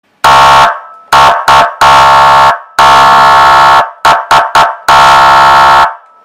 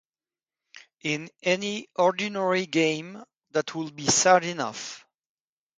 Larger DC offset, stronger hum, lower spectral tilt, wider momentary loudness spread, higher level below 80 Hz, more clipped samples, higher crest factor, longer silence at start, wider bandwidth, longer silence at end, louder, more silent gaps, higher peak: first, 0.5% vs under 0.1%; neither; about the same, -2 dB/octave vs -3 dB/octave; second, 5 LU vs 14 LU; first, -32 dBFS vs -70 dBFS; first, 3% vs under 0.1%; second, 4 dB vs 22 dB; second, 0.25 s vs 0.75 s; first, 16.5 kHz vs 9.6 kHz; second, 0.3 s vs 0.8 s; first, -4 LUFS vs -25 LUFS; neither; first, 0 dBFS vs -4 dBFS